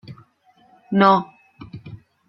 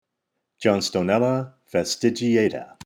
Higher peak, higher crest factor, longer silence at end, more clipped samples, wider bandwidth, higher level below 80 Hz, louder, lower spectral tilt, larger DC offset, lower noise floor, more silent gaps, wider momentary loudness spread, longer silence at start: first, -2 dBFS vs -6 dBFS; about the same, 20 dB vs 18 dB; first, 0.35 s vs 0.2 s; neither; second, 6 kHz vs 16.5 kHz; about the same, -62 dBFS vs -64 dBFS; first, -17 LUFS vs -22 LUFS; first, -8 dB/octave vs -5 dB/octave; neither; second, -57 dBFS vs -79 dBFS; neither; first, 24 LU vs 6 LU; second, 0.1 s vs 0.6 s